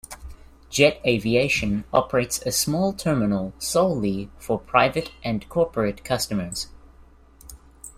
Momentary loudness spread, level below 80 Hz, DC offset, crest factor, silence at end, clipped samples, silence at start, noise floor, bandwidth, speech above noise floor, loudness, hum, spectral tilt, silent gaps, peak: 10 LU; -46 dBFS; under 0.1%; 22 dB; 0.05 s; under 0.1%; 0.1 s; -51 dBFS; 16 kHz; 28 dB; -23 LUFS; none; -4.5 dB/octave; none; -2 dBFS